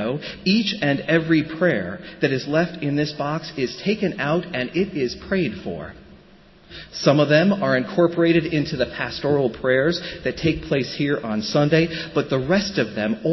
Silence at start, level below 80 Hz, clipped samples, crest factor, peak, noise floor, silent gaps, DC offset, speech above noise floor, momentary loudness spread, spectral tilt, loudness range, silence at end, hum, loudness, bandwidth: 0 s; -48 dBFS; under 0.1%; 18 dB; -4 dBFS; -49 dBFS; none; under 0.1%; 28 dB; 8 LU; -6.5 dB/octave; 5 LU; 0 s; none; -21 LUFS; 6.2 kHz